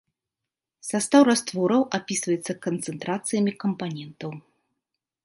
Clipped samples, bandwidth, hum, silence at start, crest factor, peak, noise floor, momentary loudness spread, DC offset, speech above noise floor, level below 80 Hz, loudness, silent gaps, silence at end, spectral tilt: under 0.1%; 11.5 kHz; none; 0.85 s; 22 dB; -4 dBFS; -87 dBFS; 18 LU; under 0.1%; 64 dB; -72 dBFS; -24 LUFS; none; 0.85 s; -4.5 dB/octave